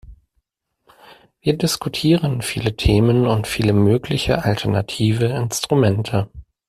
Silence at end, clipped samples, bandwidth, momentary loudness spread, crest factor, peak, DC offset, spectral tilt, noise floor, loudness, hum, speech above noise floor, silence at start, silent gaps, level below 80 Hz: 0.25 s; under 0.1%; 14.5 kHz; 7 LU; 16 dB; -2 dBFS; under 0.1%; -6 dB/octave; -70 dBFS; -19 LUFS; none; 53 dB; 0.1 s; none; -36 dBFS